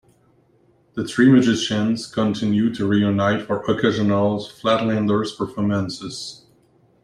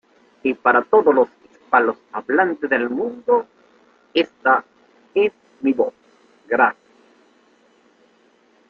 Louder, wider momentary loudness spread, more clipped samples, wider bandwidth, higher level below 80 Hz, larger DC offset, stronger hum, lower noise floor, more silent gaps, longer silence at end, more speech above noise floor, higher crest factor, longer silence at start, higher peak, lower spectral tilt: about the same, -20 LUFS vs -19 LUFS; first, 13 LU vs 9 LU; neither; first, 11 kHz vs 5.8 kHz; first, -58 dBFS vs -66 dBFS; neither; second, none vs 60 Hz at -65 dBFS; about the same, -58 dBFS vs -57 dBFS; neither; second, 0.7 s vs 2 s; about the same, 39 dB vs 39 dB; about the same, 18 dB vs 20 dB; first, 0.95 s vs 0.45 s; about the same, -4 dBFS vs -2 dBFS; about the same, -6 dB/octave vs -6.5 dB/octave